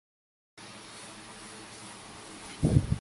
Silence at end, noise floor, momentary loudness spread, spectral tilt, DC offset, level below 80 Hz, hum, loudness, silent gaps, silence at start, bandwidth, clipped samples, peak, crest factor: 0 s; -47 dBFS; 19 LU; -6 dB/octave; under 0.1%; -44 dBFS; none; -35 LUFS; none; 0.6 s; 11.5 kHz; under 0.1%; -10 dBFS; 24 dB